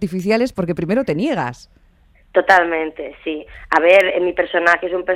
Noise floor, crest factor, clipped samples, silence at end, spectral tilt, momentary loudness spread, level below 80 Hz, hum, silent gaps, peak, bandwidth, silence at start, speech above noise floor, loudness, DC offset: -52 dBFS; 18 dB; under 0.1%; 0 s; -6 dB/octave; 15 LU; -48 dBFS; none; none; 0 dBFS; 15.5 kHz; 0 s; 35 dB; -17 LUFS; under 0.1%